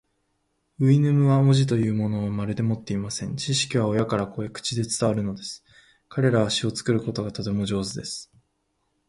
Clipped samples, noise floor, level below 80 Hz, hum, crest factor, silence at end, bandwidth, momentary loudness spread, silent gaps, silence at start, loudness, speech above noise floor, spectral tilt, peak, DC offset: under 0.1%; -73 dBFS; -54 dBFS; none; 18 dB; 0.85 s; 11.5 kHz; 12 LU; none; 0.8 s; -24 LUFS; 50 dB; -6 dB/octave; -6 dBFS; under 0.1%